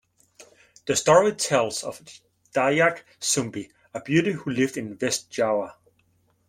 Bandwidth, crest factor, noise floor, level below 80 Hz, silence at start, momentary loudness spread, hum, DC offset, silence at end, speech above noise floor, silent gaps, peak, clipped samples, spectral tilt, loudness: 16.5 kHz; 22 dB; -66 dBFS; -64 dBFS; 0.4 s; 19 LU; none; under 0.1%; 0.75 s; 42 dB; none; -4 dBFS; under 0.1%; -3.5 dB/octave; -23 LUFS